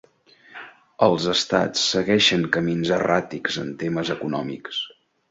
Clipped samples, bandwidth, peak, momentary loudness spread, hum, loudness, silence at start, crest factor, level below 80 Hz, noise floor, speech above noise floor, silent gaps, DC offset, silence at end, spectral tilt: under 0.1%; 8 kHz; -2 dBFS; 12 LU; none; -22 LUFS; 0.5 s; 22 dB; -58 dBFS; -53 dBFS; 31 dB; none; under 0.1%; 0.4 s; -4 dB/octave